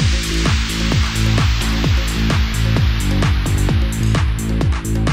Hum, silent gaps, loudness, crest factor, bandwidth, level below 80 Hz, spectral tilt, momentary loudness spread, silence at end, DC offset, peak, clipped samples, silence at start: none; none; -17 LUFS; 12 dB; 16 kHz; -20 dBFS; -5 dB/octave; 2 LU; 0 s; under 0.1%; -2 dBFS; under 0.1%; 0 s